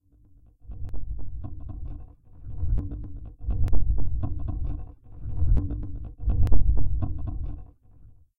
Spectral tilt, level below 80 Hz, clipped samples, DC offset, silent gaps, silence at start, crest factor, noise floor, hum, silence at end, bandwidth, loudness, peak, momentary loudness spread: -10.5 dB/octave; -30 dBFS; under 0.1%; under 0.1%; none; 0 s; 18 dB; -55 dBFS; none; 0 s; 1.7 kHz; -32 LUFS; -4 dBFS; 16 LU